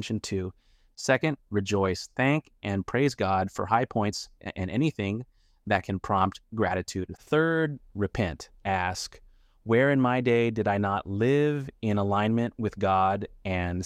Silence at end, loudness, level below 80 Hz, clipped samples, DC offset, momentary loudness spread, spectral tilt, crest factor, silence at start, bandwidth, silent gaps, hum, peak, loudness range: 0 s; -27 LUFS; -54 dBFS; under 0.1%; under 0.1%; 10 LU; -6 dB/octave; 20 dB; 0 s; 14.5 kHz; none; none; -8 dBFS; 3 LU